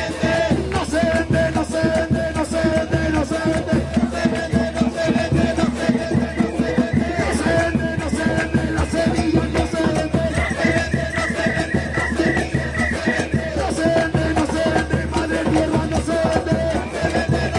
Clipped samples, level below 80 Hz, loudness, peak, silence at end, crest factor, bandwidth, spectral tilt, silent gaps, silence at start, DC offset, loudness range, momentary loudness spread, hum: under 0.1%; -34 dBFS; -20 LUFS; -4 dBFS; 0 s; 16 dB; 11.5 kHz; -6 dB/octave; none; 0 s; under 0.1%; 1 LU; 3 LU; none